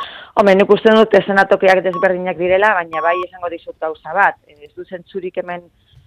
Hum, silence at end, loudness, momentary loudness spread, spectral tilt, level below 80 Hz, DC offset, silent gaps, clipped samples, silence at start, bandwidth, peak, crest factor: none; 0.45 s; -14 LUFS; 16 LU; -6 dB/octave; -54 dBFS; under 0.1%; none; under 0.1%; 0 s; 10.5 kHz; 0 dBFS; 16 dB